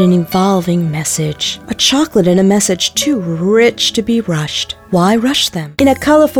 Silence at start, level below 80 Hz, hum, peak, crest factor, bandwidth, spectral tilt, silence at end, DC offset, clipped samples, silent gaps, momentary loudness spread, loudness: 0 s; -44 dBFS; none; 0 dBFS; 12 dB; 18.5 kHz; -4.5 dB/octave; 0 s; under 0.1%; under 0.1%; none; 6 LU; -13 LUFS